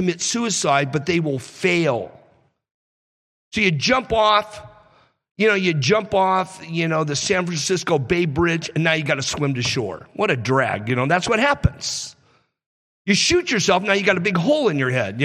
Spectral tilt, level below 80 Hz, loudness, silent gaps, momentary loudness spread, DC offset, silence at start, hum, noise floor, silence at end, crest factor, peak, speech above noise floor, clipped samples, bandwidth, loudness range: -4 dB/octave; -44 dBFS; -19 LUFS; 2.71-3.51 s, 5.31-5.35 s, 12.66-13.05 s; 8 LU; under 0.1%; 0 s; none; -60 dBFS; 0 s; 18 dB; -4 dBFS; 40 dB; under 0.1%; 13.5 kHz; 3 LU